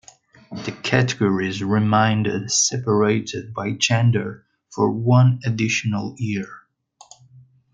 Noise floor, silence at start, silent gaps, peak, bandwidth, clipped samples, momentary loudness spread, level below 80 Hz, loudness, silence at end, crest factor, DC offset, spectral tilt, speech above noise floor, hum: -53 dBFS; 0.5 s; none; -2 dBFS; 9.4 kHz; under 0.1%; 12 LU; -60 dBFS; -20 LUFS; 1.15 s; 18 dB; under 0.1%; -5 dB/octave; 33 dB; none